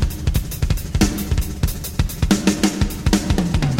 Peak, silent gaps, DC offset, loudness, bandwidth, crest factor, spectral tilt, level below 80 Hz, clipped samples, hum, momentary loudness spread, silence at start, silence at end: -2 dBFS; none; 0.3%; -20 LUFS; 16.5 kHz; 18 dB; -5 dB/octave; -24 dBFS; under 0.1%; none; 6 LU; 0 s; 0 s